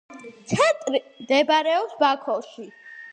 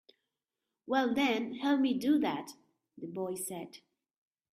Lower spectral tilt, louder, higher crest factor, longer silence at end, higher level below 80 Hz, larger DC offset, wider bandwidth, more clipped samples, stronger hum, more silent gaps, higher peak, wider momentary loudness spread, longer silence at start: about the same, -4 dB/octave vs -4 dB/octave; first, -22 LUFS vs -32 LUFS; about the same, 18 dB vs 18 dB; second, 0.05 s vs 0.75 s; first, -64 dBFS vs -78 dBFS; neither; second, 9.8 kHz vs 15.5 kHz; neither; neither; neither; first, -6 dBFS vs -16 dBFS; first, 22 LU vs 16 LU; second, 0.1 s vs 0.85 s